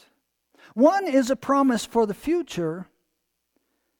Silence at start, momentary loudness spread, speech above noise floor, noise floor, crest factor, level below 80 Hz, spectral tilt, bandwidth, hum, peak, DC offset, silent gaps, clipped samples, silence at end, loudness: 0.75 s; 11 LU; 55 dB; -77 dBFS; 18 dB; -60 dBFS; -5.5 dB/octave; 18.5 kHz; none; -6 dBFS; under 0.1%; none; under 0.1%; 1.15 s; -23 LUFS